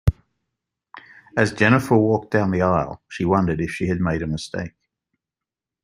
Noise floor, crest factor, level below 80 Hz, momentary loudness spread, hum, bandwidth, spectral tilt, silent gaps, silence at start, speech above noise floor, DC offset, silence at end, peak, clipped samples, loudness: -88 dBFS; 20 dB; -40 dBFS; 12 LU; none; 15.5 kHz; -7 dB/octave; none; 0.05 s; 68 dB; under 0.1%; 1.15 s; -2 dBFS; under 0.1%; -21 LUFS